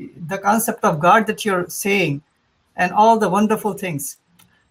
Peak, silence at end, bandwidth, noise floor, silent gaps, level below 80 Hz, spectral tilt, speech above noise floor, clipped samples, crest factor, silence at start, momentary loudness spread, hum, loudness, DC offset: -2 dBFS; 0.6 s; 16.5 kHz; -55 dBFS; none; -62 dBFS; -4.5 dB/octave; 37 dB; under 0.1%; 18 dB; 0 s; 14 LU; none; -18 LUFS; under 0.1%